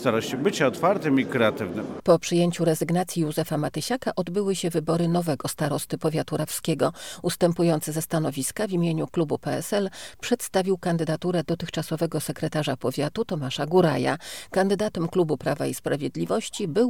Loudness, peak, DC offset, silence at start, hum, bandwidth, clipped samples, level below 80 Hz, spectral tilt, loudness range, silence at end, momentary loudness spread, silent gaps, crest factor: -25 LUFS; -6 dBFS; 0.3%; 0 s; none; 18.5 kHz; under 0.1%; -60 dBFS; -5.5 dB/octave; 3 LU; 0 s; 6 LU; none; 18 dB